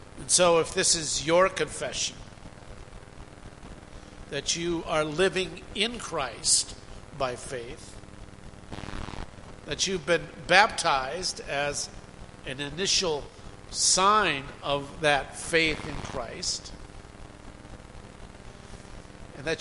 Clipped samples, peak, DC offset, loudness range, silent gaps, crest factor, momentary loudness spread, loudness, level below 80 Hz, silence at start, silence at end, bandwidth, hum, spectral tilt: under 0.1%; -2 dBFS; 0.1%; 9 LU; none; 28 dB; 25 LU; -26 LUFS; -48 dBFS; 0 s; 0 s; 11.5 kHz; none; -2 dB/octave